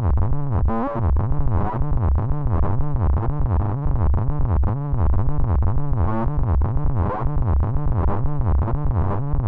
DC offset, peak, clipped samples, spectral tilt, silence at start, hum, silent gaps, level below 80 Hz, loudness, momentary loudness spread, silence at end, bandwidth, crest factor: under 0.1%; -8 dBFS; under 0.1%; -12.5 dB/octave; 0 s; none; none; -22 dBFS; -22 LUFS; 2 LU; 0 s; 2.7 kHz; 10 dB